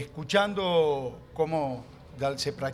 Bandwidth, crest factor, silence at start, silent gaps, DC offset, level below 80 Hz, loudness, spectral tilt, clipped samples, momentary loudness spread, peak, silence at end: 14.5 kHz; 20 dB; 0 s; none; under 0.1%; -56 dBFS; -28 LUFS; -5 dB/octave; under 0.1%; 12 LU; -8 dBFS; 0 s